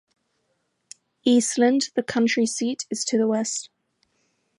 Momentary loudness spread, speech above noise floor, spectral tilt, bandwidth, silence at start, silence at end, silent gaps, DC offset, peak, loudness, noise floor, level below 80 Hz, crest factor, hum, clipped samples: 8 LU; 51 dB; -3 dB/octave; 11.5 kHz; 1.25 s; 0.95 s; none; under 0.1%; -8 dBFS; -23 LUFS; -73 dBFS; -72 dBFS; 18 dB; none; under 0.1%